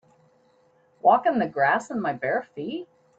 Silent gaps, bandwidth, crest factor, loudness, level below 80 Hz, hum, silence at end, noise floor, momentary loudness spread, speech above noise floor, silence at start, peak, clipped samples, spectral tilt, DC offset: none; 8 kHz; 18 dB; -24 LUFS; -72 dBFS; none; 0.35 s; -62 dBFS; 14 LU; 38 dB; 1.05 s; -6 dBFS; under 0.1%; -6 dB/octave; under 0.1%